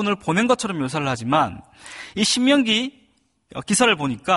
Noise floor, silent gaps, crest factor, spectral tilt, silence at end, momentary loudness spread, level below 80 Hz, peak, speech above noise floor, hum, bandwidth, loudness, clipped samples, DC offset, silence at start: -62 dBFS; none; 16 dB; -3.5 dB/octave; 0 s; 19 LU; -56 dBFS; -4 dBFS; 41 dB; none; 11.5 kHz; -20 LUFS; under 0.1%; under 0.1%; 0 s